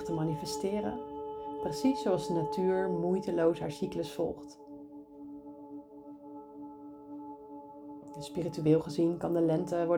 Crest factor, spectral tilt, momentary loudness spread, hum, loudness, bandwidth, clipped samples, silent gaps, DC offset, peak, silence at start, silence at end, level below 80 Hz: 20 dB; -7 dB/octave; 19 LU; none; -32 LUFS; 17 kHz; under 0.1%; none; under 0.1%; -14 dBFS; 0 s; 0 s; -64 dBFS